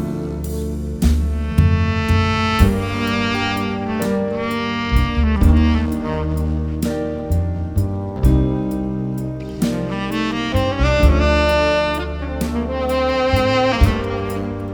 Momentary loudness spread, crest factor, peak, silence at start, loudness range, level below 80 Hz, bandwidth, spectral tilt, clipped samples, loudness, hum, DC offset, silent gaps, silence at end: 8 LU; 18 dB; 0 dBFS; 0 s; 3 LU; -22 dBFS; over 20 kHz; -6.5 dB/octave; under 0.1%; -19 LUFS; none; 0.1%; none; 0 s